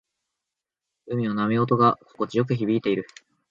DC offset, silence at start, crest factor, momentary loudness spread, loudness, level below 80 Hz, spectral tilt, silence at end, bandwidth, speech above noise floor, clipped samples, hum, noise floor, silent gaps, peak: under 0.1%; 1.05 s; 18 dB; 10 LU; -24 LUFS; -66 dBFS; -8 dB/octave; 0.45 s; 7.6 kHz; 63 dB; under 0.1%; none; -86 dBFS; none; -6 dBFS